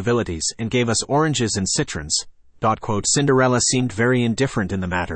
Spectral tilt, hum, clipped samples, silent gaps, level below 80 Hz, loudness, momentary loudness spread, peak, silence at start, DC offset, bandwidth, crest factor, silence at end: -4 dB/octave; none; under 0.1%; none; -46 dBFS; -20 LUFS; 7 LU; -6 dBFS; 0 s; under 0.1%; 8.8 kHz; 14 dB; 0 s